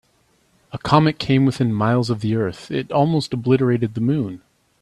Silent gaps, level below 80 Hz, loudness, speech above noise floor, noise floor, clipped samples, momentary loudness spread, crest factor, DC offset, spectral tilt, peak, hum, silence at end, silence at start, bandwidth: none; -52 dBFS; -19 LUFS; 43 dB; -61 dBFS; under 0.1%; 11 LU; 20 dB; under 0.1%; -7.5 dB/octave; 0 dBFS; none; 0.45 s; 0.75 s; 11.5 kHz